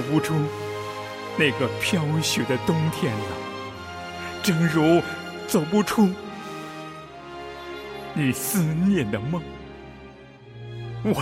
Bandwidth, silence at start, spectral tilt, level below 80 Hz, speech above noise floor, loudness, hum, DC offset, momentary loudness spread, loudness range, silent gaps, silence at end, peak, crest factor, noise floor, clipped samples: 16 kHz; 0 s; -5.5 dB/octave; -54 dBFS; 23 dB; -24 LUFS; none; under 0.1%; 18 LU; 3 LU; none; 0 s; -8 dBFS; 16 dB; -45 dBFS; under 0.1%